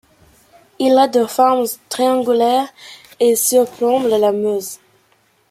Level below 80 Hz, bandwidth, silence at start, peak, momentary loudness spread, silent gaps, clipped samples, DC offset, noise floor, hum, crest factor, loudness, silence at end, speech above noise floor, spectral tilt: -62 dBFS; 16 kHz; 0.8 s; -2 dBFS; 9 LU; none; under 0.1%; under 0.1%; -58 dBFS; none; 16 dB; -15 LUFS; 0.75 s; 43 dB; -3 dB/octave